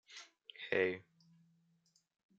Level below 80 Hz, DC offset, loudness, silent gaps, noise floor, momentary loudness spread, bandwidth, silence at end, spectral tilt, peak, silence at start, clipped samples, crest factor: under -90 dBFS; under 0.1%; -37 LUFS; none; -76 dBFS; 19 LU; 8 kHz; 1.35 s; -4.5 dB/octave; -18 dBFS; 0.1 s; under 0.1%; 24 dB